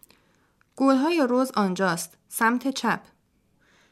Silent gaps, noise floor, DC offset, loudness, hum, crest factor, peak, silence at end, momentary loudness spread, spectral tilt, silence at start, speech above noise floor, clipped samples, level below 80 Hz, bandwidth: none; -66 dBFS; under 0.1%; -24 LUFS; none; 18 dB; -8 dBFS; 0.95 s; 8 LU; -4.5 dB/octave; 0.75 s; 43 dB; under 0.1%; -72 dBFS; 15 kHz